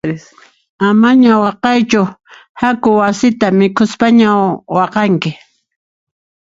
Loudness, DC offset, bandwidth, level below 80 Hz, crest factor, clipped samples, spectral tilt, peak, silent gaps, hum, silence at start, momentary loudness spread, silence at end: -12 LUFS; under 0.1%; 7.8 kHz; -52 dBFS; 12 dB; under 0.1%; -6 dB/octave; 0 dBFS; 0.69-0.78 s, 2.49-2.55 s; none; 0.05 s; 8 LU; 1.15 s